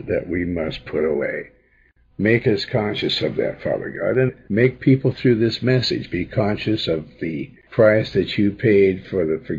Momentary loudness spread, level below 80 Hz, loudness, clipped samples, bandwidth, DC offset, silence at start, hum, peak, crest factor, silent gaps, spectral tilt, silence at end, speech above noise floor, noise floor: 9 LU; -48 dBFS; -20 LUFS; under 0.1%; 7.4 kHz; under 0.1%; 0 s; none; -4 dBFS; 16 dB; none; -7.5 dB/octave; 0 s; 38 dB; -57 dBFS